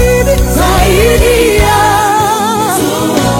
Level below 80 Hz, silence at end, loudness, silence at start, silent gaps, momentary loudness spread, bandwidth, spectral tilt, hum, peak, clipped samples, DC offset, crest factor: -16 dBFS; 0 s; -9 LUFS; 0 s; none; 3 LU; 17 kHz; -4.5 dB/octave; none; 0 dBFS; 0.3%; under 0.1%; 8 dB